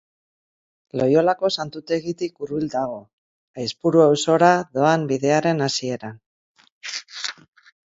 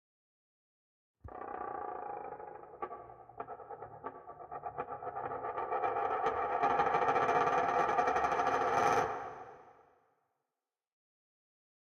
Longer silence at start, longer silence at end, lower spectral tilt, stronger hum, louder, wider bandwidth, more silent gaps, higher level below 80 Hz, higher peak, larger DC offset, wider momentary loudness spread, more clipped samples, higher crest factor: second, 0.95 s vs 1.25 s; second, 0.6 s vs 2.3 s; about the same, -5 dB/octave vs -4.5 dB/octave; neither; first, -21 LUFS vs -33 LUFS; second, 7.8 kHz vs 15.5 kHz; first, 3.13-3.54 s, 6.26-6.55 s, 6.72-6.81 s vs none; about the same, -64 dBFS vs -68 dBFS; first, 0 dBFS vs -18 dBFS; neither; second, 15 LU vs 18 LU; neither; about the same, 22 dB vs 18 dB